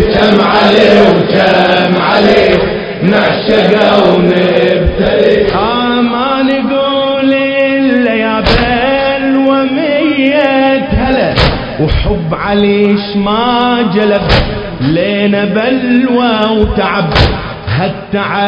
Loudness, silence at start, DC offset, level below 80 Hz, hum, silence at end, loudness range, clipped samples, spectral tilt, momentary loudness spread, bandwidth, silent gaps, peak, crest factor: -10 LUFS; 0 s; under 0.1%; -24 dBFS; none; 0 s; 3 LU; 1%; -7 dB/octave; 6 LU; 8 kHz; none; 0 dBFS; 10 dB